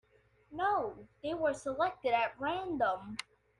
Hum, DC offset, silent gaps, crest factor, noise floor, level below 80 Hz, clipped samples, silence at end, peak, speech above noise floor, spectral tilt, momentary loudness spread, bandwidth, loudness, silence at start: 60 Hz at -65 dBFS; under 0.1%; none; 18 dB; -65 dBFS; -66 dBFS; under 0.1%; 0.35 s; -18 dBFS; 31 dB; -4.5 dB/octave; 12 LU; 11.5 kHz; -35 LUFS; 0.5 s